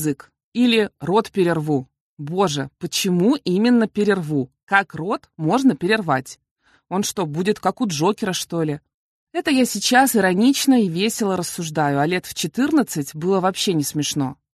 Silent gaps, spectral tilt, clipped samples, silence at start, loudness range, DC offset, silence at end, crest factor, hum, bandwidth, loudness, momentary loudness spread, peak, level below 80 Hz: 0.44-0.52 s, 2.00-2.17 s, 4.63-4.67 s, 6.51-6.56 s, 8.94-9.27 s; -4.5 dB/octave; under 0.1%; 0 s; 4 LU; under 0.1%; 0.25 s; 18 dB; none; 13 kHz; -20 LUFS; 9 LU; -2 dBFS; -60 dBFS